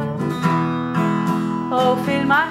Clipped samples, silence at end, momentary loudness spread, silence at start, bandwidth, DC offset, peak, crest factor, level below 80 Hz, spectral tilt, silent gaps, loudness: under 0.1%; 0 s; 4 LU; 0 s; 14.5 kHz; under 0.1%; -4 dBFS; 14 dB; -54 dBFS; -7 dB/octave; none; -19 LUFS